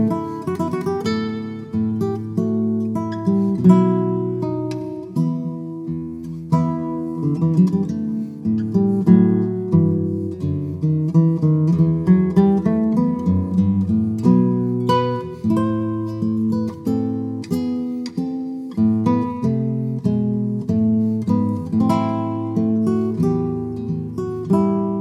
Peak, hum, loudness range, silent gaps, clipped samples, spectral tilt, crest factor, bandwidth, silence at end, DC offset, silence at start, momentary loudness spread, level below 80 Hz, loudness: 0 dBFS; none; 5 LU; none; under 0.1%; -9.5 dB/octave; 18 dB; 8 kHz; 0 s; under 0.1%; 0 s; 10 LU; -50 dBFS; -20 LUFS